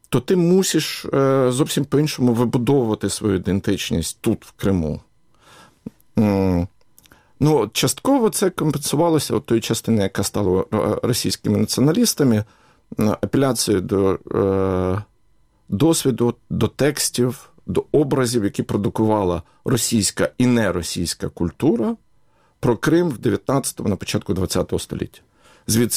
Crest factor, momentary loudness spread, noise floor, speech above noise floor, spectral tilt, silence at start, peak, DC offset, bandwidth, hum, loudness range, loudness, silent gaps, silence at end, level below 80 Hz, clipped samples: 16 dB; 8 LU; -60 dBFS; 41 dB; -5 dB/octave; 0.1 s; -4 dBFS; under 0.1%; 16.5 kHz; none; 3 LU; -20 LUFS; none; 0 s; -46 dBFS; under 0.1%